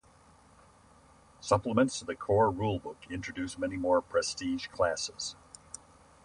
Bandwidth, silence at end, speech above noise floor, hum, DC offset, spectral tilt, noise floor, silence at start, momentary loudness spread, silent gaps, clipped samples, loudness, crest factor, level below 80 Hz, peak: 11.5 kHz; 0.9 s; 29 dB; none; under 0.1%; -4.5 dB/octave; -60 dBFS; 1.4 s; 18 LU; none; under 0.1%; -31 LUFS; 22 dB; -56 dBFS; -12 dBFS